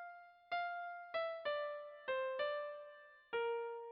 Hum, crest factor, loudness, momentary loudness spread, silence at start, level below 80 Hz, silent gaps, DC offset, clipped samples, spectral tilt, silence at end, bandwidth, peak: none; 14 dB; -43 LUFS; 14 LU; 0 s; -88 dBFS; none; under 0.1%; under 0.1%; 2 dB/octave; 0 s; 5.8 kHz; -30 dBFS